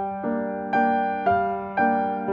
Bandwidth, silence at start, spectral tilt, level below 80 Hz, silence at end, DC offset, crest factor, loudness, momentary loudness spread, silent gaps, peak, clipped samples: 5.2 kHz; 0 s; -8.5 dB/octave; -58 dBFS; 0 s; under 0.1%; 14 dB; -24 LUFS; 5 LU; none; -10 dBFS; under 0.1%